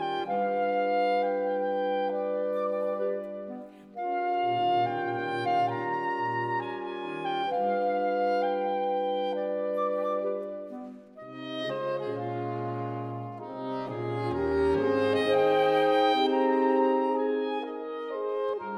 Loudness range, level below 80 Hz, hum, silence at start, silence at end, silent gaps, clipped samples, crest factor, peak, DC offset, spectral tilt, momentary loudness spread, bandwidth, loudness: 8 LU; -60 dBFS; none; 0 s; 0 s; none; under 0.1%; 16 dB; -12 dBFS; under 0.1%; -7 dB/octave; 12 LU; 10 kHz; -28 LUFS